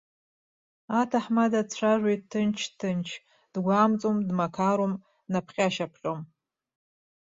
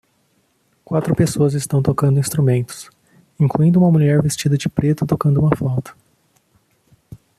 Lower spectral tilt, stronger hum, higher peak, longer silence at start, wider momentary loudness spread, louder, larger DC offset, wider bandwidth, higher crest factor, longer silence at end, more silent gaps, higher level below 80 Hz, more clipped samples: about the same, -6 dB/octave vs -7 dB/octave; neither; second, -8 dBFS vs -2 dBFS; about the same, 0.9 s vs 0.9 s; about the same, 11 LU vs 9 LU; second, -27 LUFS vs -17 LUFS; neither; second, 7.8 kHz vs 14.5 kHz; about the same, 20 dB vs 16 dB; first, 0.95 s vs 0.25 s; neither; second, -70 dBFS vs -48 dBFS; neither